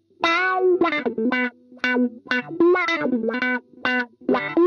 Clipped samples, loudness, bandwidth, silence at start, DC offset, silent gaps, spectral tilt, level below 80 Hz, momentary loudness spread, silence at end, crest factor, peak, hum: under 0.1%; -22 LUFS; 6.8 kHz; 0.2 s; under 0.1%; none; -5 dB/octave; -66 dBFS; 6 LU; 0 s; 16 dB; -6 dBFS; none